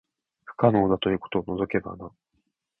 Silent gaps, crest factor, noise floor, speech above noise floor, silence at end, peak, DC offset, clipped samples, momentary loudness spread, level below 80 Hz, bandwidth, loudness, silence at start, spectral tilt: none; 24 dB; -75 dBFS; 51 dB; 0.7 s; -4 dBFS; under 0.1%; under 0.1%; 21 LU; -54 dBFS; 4.2 kHz; -25 LUFS; 0.5 s; -10 dB/octave